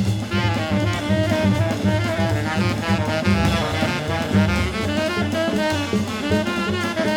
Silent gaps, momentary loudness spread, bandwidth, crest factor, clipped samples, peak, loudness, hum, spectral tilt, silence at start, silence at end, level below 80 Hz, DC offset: none; 3 LU; 17 kHz; 16 dB; under 0.1%; -4 dBFS; -21 LUFS; none; -6 dB/octave; 0 s; 0 s; -36 dBFS; under 0.1%